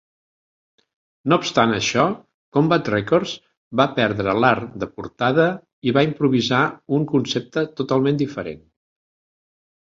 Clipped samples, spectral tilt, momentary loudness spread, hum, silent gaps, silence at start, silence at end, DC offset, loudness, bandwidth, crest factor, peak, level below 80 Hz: under 0.1%; -5.5 dB/octave; 12 LU; none; 2.34-2.52 s, 3.57-3.71 s, 5.73-5.82 s; 1.25 s; 1.35 s; under 0.1%; -20 LUFS; 7.8 kHz; 20 dB; -2 dBFS; -56 dBFS